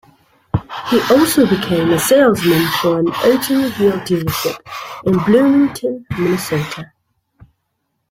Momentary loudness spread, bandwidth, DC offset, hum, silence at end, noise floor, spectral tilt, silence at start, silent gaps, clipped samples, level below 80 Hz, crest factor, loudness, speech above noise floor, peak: 12 LU; 16.5 kHz; under 0.1%; none; 1.25 s; -70 dBFS; -5 dB/octave; 0.55 s; none; under 0.1%; -46 dBFS; 14 dB; -15 LUFS; 56 dB; -2 dBFS